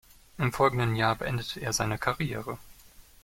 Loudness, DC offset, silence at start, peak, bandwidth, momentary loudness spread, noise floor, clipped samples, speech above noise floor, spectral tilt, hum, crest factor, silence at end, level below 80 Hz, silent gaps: -29 LUFS; under 0.1%; 0.4 s; -10 dBFS; 16.5 kHz; 10 LU; -54 dBFS; under 0.1%; 25 dB; -4.5 dB/octave; none; 20 dB; 0.2 s; -52 dBFS; none